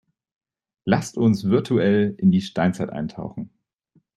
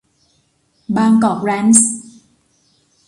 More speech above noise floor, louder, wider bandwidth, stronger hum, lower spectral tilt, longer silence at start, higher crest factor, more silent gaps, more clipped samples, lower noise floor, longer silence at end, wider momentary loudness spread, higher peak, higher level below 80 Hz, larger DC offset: second, 43 dB vs 48 dB; second, -21 LUFS vs -13 LUFS; about the same, 12 kHz vs 11.5 kHz; neither; first, -7 dB/octave vs -4 dB/octave; about the same, 0.85 s vs 0.9 s; about the same, 18 dB vs 18 dB; neither; neither; first, -64 dBFS vs -60 dBFS; second, 0.7 s vs 1.05 s; first, 15 LU vs 10 LU; second, -4 dBFS vs 0 dBFS; about the same, -58 dBFS vs -58 dBFS; neither